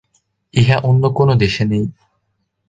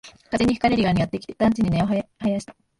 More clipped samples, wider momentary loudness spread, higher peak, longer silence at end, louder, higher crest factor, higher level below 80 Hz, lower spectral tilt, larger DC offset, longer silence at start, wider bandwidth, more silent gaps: neither; about the same, 8 LU vs 7 LU; first, 0 dBFS vs -6 dBFS; first, 0.8 s vs 0.3 s; first, -15 LUFS vs -22 LUFS; about the same, 16 dB vs 16 dB; about the same, -42 dBFS vs -44 dBFS; about the same, -7 dB/octave vs -7 dB/octave; neither; first, 0.55 s vs 0.05 s; second, 7.8 kHz vs 11.5 kHz; neither